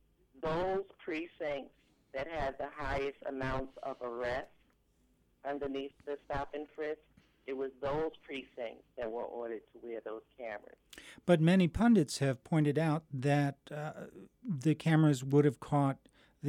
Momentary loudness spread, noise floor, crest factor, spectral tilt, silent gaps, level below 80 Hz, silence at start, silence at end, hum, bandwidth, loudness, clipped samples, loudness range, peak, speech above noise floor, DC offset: 17 LU; -72 dBFS; 20 dB; -7 dB/octave; none; -56 dBFS; 0.35 s; 0 s; none; 13.5 kHz; -34 LUFS; under 0.1%; 11 LU; -16 dBFS; 38 dB; under 0.1%